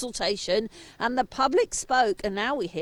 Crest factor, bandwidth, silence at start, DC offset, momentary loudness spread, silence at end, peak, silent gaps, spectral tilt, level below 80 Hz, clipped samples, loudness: 16 dB; 19 kHz; 0 s; under 0.1%; 5 LU; 0 s; -10 dBFS; none; -3 dB/octave; -52 dBFS; under 0.1%; -26 LUFS